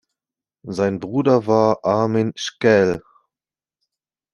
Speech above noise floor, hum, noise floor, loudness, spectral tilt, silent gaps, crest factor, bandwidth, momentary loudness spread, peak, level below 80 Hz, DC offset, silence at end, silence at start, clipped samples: over 72 dB; none; under -90 dBFS; -18 LUFS; -6 dB/octave; none; 18 dB; 11 kHz; 8 LU; -2 dBFS; -56 dBFS; under 0.1%; 1.35 s; 0.65 s; under 0.1%